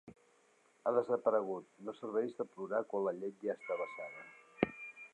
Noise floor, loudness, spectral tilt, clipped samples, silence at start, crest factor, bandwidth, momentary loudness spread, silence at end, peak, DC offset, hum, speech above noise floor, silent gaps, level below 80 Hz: -70 dBFS; -38 LUFS; -7 dB/octave; under 0.1%; 0.05 s; 26 dB; 9.6 kHz; 14 LU; 0.05 s; -12 dBFS; under 0.1%; none; 33 dB; none; -76 dBFS